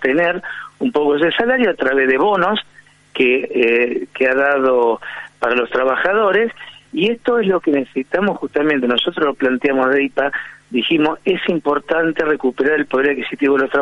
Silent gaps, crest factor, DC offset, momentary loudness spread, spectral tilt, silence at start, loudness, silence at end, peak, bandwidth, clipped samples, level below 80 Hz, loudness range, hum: none; 14 dB; under 0.1%; 7 LU; -6.5 dB/octave; 0 s; -16 LUFS; 0 s; -2 dBFS; 7.8 kHz; under 0.1%; -56 dBFS; 2 LU; none